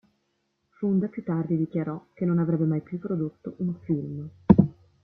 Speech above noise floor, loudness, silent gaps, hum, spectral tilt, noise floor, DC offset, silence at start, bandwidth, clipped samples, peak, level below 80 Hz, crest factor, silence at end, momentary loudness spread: 47 dB; -26 LUFS; none; none; -12.5 dB/octave; -75 dBFS; under 0.1%; 0.8 s; 3.7 kHz; under 0.1%; -2 dBFS; -52 dBFS; 24 dB; 0.3 s; 12 LU